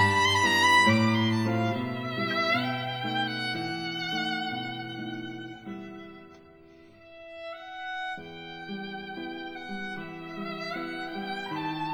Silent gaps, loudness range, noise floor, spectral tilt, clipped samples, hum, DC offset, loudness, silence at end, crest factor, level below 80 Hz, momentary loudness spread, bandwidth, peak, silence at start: none; 15 LU; -53 dBFS; -4.5 dB/octave; under 0.1%; none; under 0.1%; -28 LUFS; 0 s; 20 dB; -68 dBFS; 19 LU; over 20 kHz; -10 dBFS; 0 s